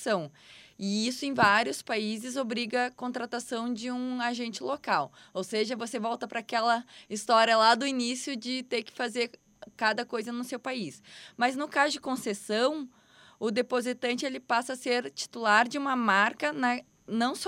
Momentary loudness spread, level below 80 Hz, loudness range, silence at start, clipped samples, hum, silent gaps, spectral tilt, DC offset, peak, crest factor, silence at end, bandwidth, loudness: 12 LU; -76 dBFS; 5 LU; 0 s; under 0.1%; none; none; -3 dB/octave; under 0.1%; -8 dBFS; 22 dB; 0 s; 16 kHz; -29 LUFS